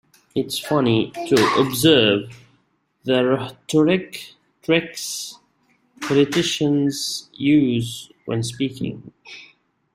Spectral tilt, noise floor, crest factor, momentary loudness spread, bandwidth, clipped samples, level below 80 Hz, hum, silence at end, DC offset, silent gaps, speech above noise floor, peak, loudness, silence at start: -4.5 dB/octave; -65 dBFS; 20 dB; 18 LU; 16 kHz; under 0.1%; -58 dBFS; none; 0.5 s; under 0.1%; none; 45 dB; -2 dBFS; -20 LUFS; 0.35 s